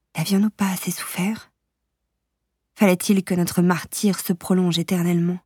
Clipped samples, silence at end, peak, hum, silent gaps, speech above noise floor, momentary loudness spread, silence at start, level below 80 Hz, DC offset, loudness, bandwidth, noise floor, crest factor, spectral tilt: under 0.1%; 0.1 s; -4 dBFS; none; none; 57 dB; 6 LU; 0.15 s; -62 dBFS; under 0.1%; -21 LUFS; 18.5 kHz; -77 dBFS; 18 dB; -5.5 dB/octave